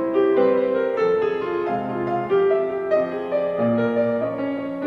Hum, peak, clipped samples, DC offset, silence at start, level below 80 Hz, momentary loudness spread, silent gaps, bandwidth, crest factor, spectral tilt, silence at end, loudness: none; -8 dBFS; under 0.1%; under 0.1%; 0 s; -60 dBFS; 6 LU; none; 5.8 kHz; 14 dB; -8.5 dB/octave; 0 s; -21 LUFS